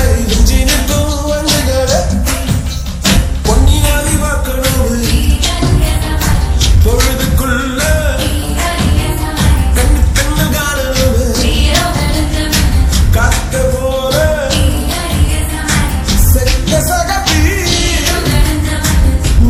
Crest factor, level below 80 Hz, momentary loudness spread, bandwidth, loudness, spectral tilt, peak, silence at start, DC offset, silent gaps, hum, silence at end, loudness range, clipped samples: 10 dB; -14 dBFS; 4 LU; 16.5 kHz; -12 LUFS; -4.5 dB/octave; 0 dBFS; 0 s; under 0.1%; none; none; 0 s; 1 LU; 0.3%